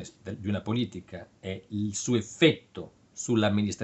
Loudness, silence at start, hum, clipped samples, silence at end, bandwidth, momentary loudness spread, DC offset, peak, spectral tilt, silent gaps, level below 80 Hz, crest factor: -28 LUFS; 0 s; none; under 0.1%; 0 s; 8.4 kHz; 19 LU; under 0.1%; -8 dBFS; -5 dB/octave; none; -64 dBFS; 22 dB